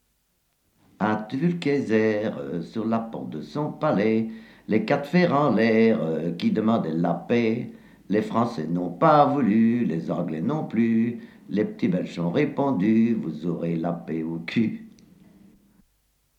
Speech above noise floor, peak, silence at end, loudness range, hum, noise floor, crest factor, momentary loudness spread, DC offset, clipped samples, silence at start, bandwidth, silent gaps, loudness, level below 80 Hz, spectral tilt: 47 dB; -6 dBFS; 1.5 s; 4 LU; none; -70 dBFS; 18 dB; 10 LU; under 0.1%; under 0.1%; 1 s; 8 kHz; none; -24 LUFS; -66 dBFS; -8.5 dB/octave